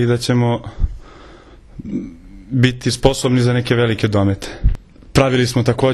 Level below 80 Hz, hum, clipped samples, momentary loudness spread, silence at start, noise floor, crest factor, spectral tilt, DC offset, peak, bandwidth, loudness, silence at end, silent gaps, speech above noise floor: -28 dBFS; none; under 0.1%; 12 LU; 0 s; -41 dBFS; 16 dB; -6 dB/octave; under 0.1%; 0 dBFS; 12.5 kHz; -17 LUFS; 0 s; none; 26 dB